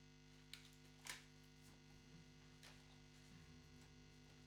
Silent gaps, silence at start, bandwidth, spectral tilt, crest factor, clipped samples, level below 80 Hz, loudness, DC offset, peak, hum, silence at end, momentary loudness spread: none; 0 s; 17 kHz; -3 dB/octave; 30 dB; under 0.1%; -74 dBFS; -62 LUFS; under 0.1%; -34 dBFS; 50 Hz at -70 dBFS; 0 s; 10 LU